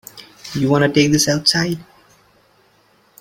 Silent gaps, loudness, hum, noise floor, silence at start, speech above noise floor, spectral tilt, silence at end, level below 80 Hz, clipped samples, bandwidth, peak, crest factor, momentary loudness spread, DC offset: none; -16 LUFS; none; -56 dBFS; 0.15 s; 40 dB; -4 dB/octave; 1.4 s; -52 dBFS; under 0.1%; 16.5 kHz; 0 dBFS; 18 dB; 17 LU; under 0.1%